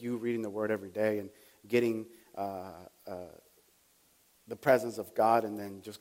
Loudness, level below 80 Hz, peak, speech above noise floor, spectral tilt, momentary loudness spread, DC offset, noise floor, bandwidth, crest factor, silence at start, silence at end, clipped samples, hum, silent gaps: -32 LUFS; -78 dBFS; -12 dBFS; 35 dB; -6 dB/octave; 19 LU; under 0.1%; -67 dBFS; 16.5 kHz; 22 dB; 0 s; 0.05 s; under 0.1%; none; none